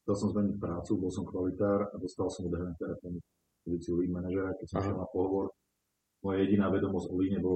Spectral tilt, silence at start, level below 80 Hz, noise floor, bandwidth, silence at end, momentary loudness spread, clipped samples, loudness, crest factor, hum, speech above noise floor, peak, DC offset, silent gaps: -8 dB/octave; 0.05 s; -56 dBFS; -82 dBFS; 8.8 kHz; 0 s; 10 LU; under 0.1%; -33 LUFS; 16 dB; none; 50 dB; -16 dBFS; under 0.1%; none